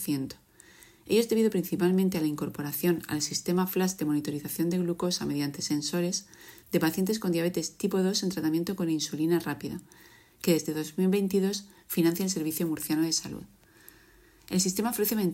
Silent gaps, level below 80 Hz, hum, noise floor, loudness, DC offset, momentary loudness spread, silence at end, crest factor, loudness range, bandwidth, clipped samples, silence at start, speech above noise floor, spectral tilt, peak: none; -64 dBFS; none; -58 dBFS; -29 LUFS; under 0.1%; 8 LU; 0 s; 16 dB; 2 LU; 16.5 kHz; under 0.1%; 0 s; 30 dB; -5 dB/octave; -12 dBFS